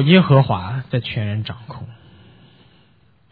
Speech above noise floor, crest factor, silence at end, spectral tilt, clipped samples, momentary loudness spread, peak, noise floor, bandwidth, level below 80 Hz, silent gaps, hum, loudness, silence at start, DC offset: 39 dB; 18 dB; 1.4 s; -10.5 dB/octave; under 0.1%; 23 LU; -2 dBFS; -56 dBFS; 4.8 kHz; -52 dBFS; none; none; -18 LUFS; 0 s; under 0.1%